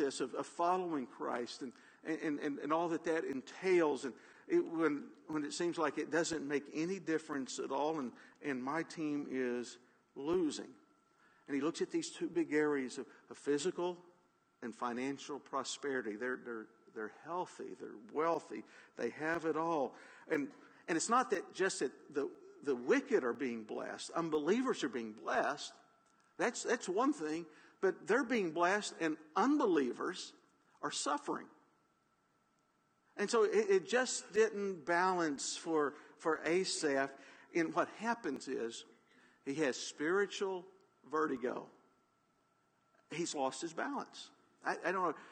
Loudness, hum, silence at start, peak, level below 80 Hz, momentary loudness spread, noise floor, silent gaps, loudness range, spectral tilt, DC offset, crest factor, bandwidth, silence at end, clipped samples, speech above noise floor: -37 LUFS; none; 0 s; -20 dBFS; -84 dBFS; 14 LU; -76 dBFS; none; 7 LU; -3.5 dB/octave; under 0.1%; 18 dB; 9.4 kHz; 0 s; under 0.1%; 39 dB